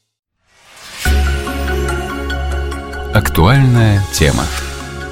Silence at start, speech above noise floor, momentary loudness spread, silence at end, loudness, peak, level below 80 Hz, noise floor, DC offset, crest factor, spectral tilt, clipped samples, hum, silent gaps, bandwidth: 0.75 s; 38 dB; 13 LU; 0 s; -15 LUFS; 0 dBFS; -22 dBFS; -48 dBFS; under 0.1%; 14 dB; -5.5 dB/octave; under 0.1%; none; none; 17 kHz